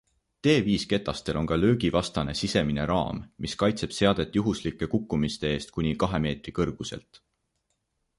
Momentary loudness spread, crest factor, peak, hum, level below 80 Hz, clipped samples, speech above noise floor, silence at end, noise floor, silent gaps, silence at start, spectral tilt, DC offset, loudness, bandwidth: 7 LU; 20 dB; -8 dBFS; none; -46 dBFS; under 0.1%; 51 dB; 1.2 s; -77 dBFS; none; 0.45 s; -6 dB/octave; under 0.1%; -27 LUFS; 11.5 kHz